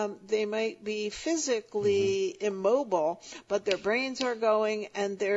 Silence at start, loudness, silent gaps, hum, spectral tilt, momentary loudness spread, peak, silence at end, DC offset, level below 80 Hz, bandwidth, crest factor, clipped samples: 0 s; -29 LUFS; none; none; -3.5 dB/octave; 6 LU; -12 dBFS; 0 s; under 0.1%; -68 dBFS; 8 kHz; 18 dB; under 0.1%